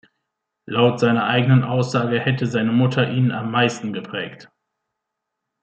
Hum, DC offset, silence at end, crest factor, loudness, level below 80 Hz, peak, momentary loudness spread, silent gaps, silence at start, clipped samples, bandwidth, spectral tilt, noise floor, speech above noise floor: none; under 0.1%; 1.2 s; 18 dB; -19 LUFS; -64 dBFS; -2 dBFS; 11 LU; none; 0.7 s; under 0.1%; 8.4 kHz; -6.5 dB/octave; -80 dBFS; 62 dB